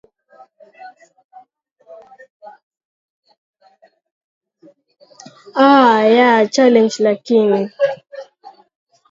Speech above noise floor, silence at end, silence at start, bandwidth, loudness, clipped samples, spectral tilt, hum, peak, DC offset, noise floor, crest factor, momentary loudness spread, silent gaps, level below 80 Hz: 41 dB; 0.85 s; 0.85 s; 7.8 kHz; -13 LUFS; under 0.1%; -5 dB/octave; none; 0 dBFS; under 0.1%; -53 dBFS; 18 dB; 16 LU; 1.24-1.29 s, 1.72-1.76 s, 2.30-2.40 s, 2.63-2.71 s, 2.85-3.23 s, 3.38-3.54 s, 4.11-4.41 s; -72 dBFS